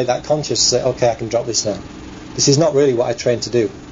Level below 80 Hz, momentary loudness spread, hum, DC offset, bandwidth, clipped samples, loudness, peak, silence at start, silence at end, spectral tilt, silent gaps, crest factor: -44 dBFS; 13 LU; none; under 0.1%; 7.8 kHz; under 0.1%; -16 LUFS; -2 dBFS; 0 s; 0 s; -4 dB/octave; none; 14 dB